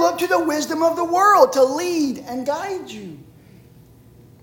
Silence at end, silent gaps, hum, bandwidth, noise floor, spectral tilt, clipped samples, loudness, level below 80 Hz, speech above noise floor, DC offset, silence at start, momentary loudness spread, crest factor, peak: 1.25 s; none; none; 17 kHz; -47 dBFS; -3.5 dB/octave; under 0.1%; -18 LUFS; -60 dBFS; 29 dB; under 0.1%; 0 s; 17 LU; 18 dB; -2 dBFS